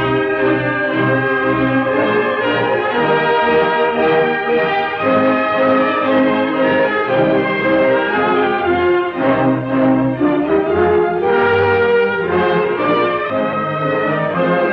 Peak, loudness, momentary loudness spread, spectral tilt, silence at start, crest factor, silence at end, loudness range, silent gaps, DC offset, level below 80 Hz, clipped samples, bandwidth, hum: -4 dBFS; -15 LUFS; 3 LU; -8.5 dB/octave; 0 s; 12 dB; 0 s; 1 LU; none; under 0.1%; -48 dBFS; under 0.1%; 5.8 kHz; none